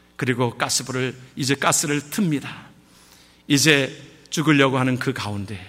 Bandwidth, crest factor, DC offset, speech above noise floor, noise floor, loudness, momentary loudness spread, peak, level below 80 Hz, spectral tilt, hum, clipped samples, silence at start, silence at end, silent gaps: 16 kHz; 20 dB; under 0.1%; 30 dB; -51 dBFS; -21 LUFS; 12 LU; -4 dBFS; -60 dBFS; -4 dB/octave; none; under 0.1%; 0.2 s; 0 s; none